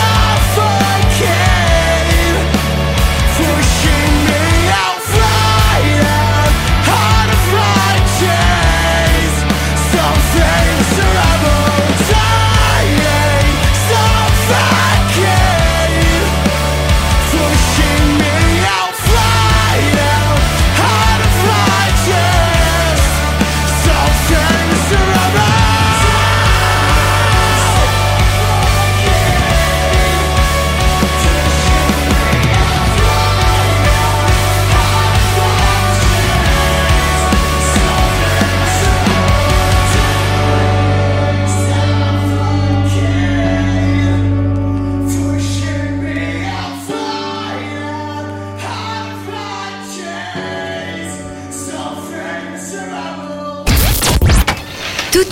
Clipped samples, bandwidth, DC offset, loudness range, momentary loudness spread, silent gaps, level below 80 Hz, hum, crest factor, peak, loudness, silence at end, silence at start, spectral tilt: under 0.1%; 16 kHz; under 0.1%; 9 LU; 11 LU; none; -18 dBFS; none; 12 dB; 0 dBFS; -12 LUFS; 0 s; 0 s; -4.5 dB/octave